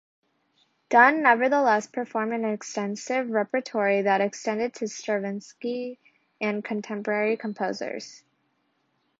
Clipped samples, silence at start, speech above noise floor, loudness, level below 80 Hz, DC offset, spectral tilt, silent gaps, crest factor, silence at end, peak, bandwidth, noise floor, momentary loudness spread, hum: under 0.1%; 0.9 s; 47 dB; -25 LUFS; -78 dBFS; under 0.1%; -4.5 dB/octave; none; 22 dB; 1.05 s; -4 dBFS; 7.8 kHz; -72 dBFS; 14 LU; none